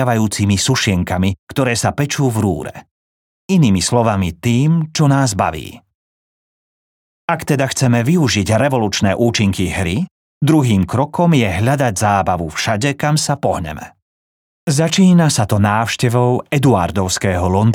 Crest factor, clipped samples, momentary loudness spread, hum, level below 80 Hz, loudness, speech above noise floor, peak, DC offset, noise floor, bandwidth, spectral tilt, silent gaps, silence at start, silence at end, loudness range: 14 dB; under 0.1%; 7 LU; none; -46 dBFS; -15 LUFS; over 75 dB; -2 dBFS; under 0.1%; under -90 dBFS; 18 kHz; -5.5 dB/octave; 1.39-1.47 s, 2.91-3.49 s, 5.95-7.28 s, 10.11-10.41 s, 14.02-14.67 s; 0 s; 0 s; 3 LU